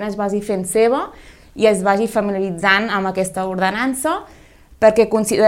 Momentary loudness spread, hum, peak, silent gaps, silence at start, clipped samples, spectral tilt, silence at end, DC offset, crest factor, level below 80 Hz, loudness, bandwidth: 7 LU; none; 0 dBFS; none; 0 s; under 0.1%; -4.5 dB/octave; 0 s; under 0.1%; 18 dB; -48 dBFS; -17 LUFS; 16.5 kHz